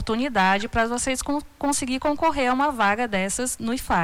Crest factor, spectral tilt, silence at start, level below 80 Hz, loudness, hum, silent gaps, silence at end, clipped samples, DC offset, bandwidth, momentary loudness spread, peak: 14 dB; -3.5 dB/octave; 0 s; -42 dBFS; -23 LUFS; none; none; 0 s; under 0.1%; under 0.1%; 19 kHz; 5 LU; -10 dBFS